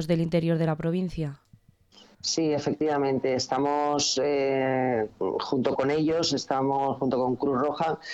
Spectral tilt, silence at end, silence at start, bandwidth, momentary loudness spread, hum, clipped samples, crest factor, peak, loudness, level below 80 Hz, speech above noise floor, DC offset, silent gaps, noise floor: -5 dB/octave; 0 s; 0 s; 12 kHz; 5 LU; none; under 0.1%; 14 dB; -12 dBFS; -26 LUFS; -56 dBFS; 33 dB; under 0.1%; none; -58 dBFS